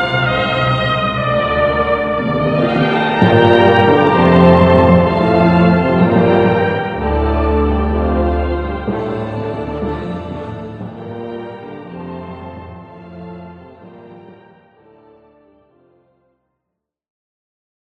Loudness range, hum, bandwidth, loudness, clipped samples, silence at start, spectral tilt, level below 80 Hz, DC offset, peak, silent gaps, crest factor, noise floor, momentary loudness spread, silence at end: 20 LU; none; 5.8 kHz; -13 LUFS; under 0.1%; 0 s; -8.5 dB/octave; -30 dBFS; under 0.1%; 0 dBFS; none; 16 dB; -78 dBFS; 21 LU; 3.8 s